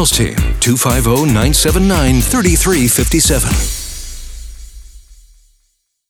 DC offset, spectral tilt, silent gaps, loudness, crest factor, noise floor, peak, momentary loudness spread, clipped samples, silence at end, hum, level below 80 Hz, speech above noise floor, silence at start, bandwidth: under 0.1%; -4 dB/octave; none; -12 LUFS; 14 dB; -63 dBFS; 0 dBFS; 16 LU; under 0.1%; 1.1 s; none; -20 dBFS; 51 dB; 0 s; 20 kHz